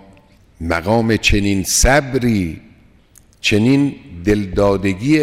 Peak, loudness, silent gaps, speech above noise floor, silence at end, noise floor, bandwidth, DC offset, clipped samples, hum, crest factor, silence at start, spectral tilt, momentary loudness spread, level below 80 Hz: -2 dBFS; -16 LUFS; none; 34 dB; 0 s; -49 dBFS; 16.5 kHz; under 0.1%; under 0.1%; none; 14 dB; 0.6 s; -4.5 dB/octave; 8 LU; -28 dBFS